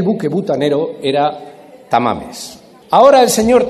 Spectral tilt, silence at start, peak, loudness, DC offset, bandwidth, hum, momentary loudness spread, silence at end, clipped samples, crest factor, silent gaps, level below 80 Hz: -4.5 dB/octave; 0 s; 0 dBFS; -13 LUFS; under 0.1%; 14 kHz; none; 20 LU; 0 s; 0.2%; 14 dB; none; -48 dBFS